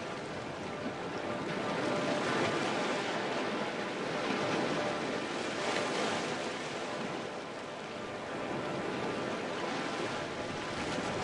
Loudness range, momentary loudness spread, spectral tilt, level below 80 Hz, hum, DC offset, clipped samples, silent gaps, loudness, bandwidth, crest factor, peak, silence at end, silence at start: 4 LU; 7 LU; -4 dB/octave; -68 dBFS; none; under 0.1%; under 0.1%; none; -35 LUFS; 11.5 kHz; 16 dB; -18 dBFS; 0 s; 0 s